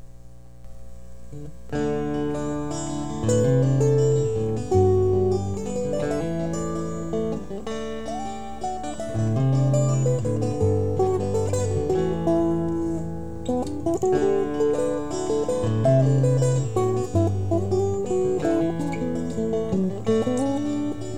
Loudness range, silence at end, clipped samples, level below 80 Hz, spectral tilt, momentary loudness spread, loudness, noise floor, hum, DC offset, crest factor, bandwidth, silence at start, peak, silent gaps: 6 LU; 0 s; under 0.1%; -44 dBFS; -7.5 dB/octave; 11 LU; -24 LUFS; -45 dBFS; none; 2%; 14 dB; 11.5 kHz; 0 s; -8 dBFS; none